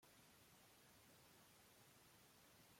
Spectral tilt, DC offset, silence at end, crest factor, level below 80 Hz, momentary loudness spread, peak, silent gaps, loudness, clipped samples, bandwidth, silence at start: -2.5 dB/octave; under 0.1%; 0 s; 14 dB; -90 dBFS; 0 LU; -56 dBFS; none; -69 LUFS; under 0.1%; 16.5 kHz; 0 s